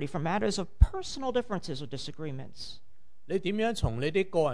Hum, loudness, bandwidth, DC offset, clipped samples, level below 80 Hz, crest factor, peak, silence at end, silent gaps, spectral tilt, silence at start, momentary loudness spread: none; -31 LUFS; 10.5 kHz; 1%; under 0.1%; -36 dBFS; 24 dB; -6 dBFS; 0 s; none; -6 dB/octave; 0 s; 13 LU